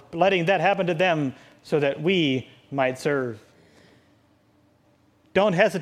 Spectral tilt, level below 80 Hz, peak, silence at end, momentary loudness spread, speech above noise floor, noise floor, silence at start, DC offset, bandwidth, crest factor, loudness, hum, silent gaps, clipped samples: -6 dB/octave; -66 dBFS; -4 dBFS; 0 s; 10 LU; 39 dB; -61 dBFS; 0.1 s; under 0.1%; 14 kHz; 20 dB; -23 LUFS; none; none; under 0.1%